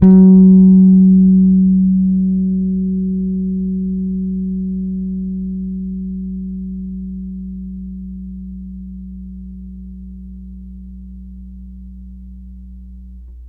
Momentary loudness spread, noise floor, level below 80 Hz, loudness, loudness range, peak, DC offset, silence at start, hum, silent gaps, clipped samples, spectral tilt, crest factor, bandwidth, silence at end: 27 LU; -34 dBFS; -34 dBFS; -13 LUFS; 23 LU; 0 dBFS; under 0.1%; 0 s; none; none; under 0.1%; -15 dB/octave; 14 dB; 1 kHz; 0 s